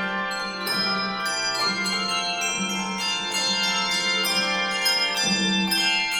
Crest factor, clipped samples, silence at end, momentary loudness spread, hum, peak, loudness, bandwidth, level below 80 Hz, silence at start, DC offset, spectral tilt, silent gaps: 14 dB; under 0.1%; 0 s; 5 LU; none; -10 dBFS; -22 LUFS; over 20 kHz; -58 dBFS; 0 s; under 0.1%; -1.5 dB/octave; none